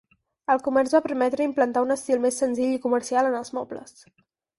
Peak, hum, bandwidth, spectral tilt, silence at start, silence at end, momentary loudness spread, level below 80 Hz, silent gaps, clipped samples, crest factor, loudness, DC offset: -6 dBFS; none; 11.5 kHz; -3.5 dB/octave; 0.5 s; 0.75 s; 11 LU; -66 dBFS; none; under 0.1%; 18 dB; -24 LUFS; under 0.1%